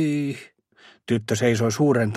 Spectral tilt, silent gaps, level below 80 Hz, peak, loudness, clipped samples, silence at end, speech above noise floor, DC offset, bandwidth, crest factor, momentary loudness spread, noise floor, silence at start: -6 dB/octave; none; -62 dBFS; -6 dBFS; -23 LUFS; under 0.1%; 0 s; 33 dB; under 0.1%; 14 kHz; 16 dB; 14 LU; -54 dBFS; 0 s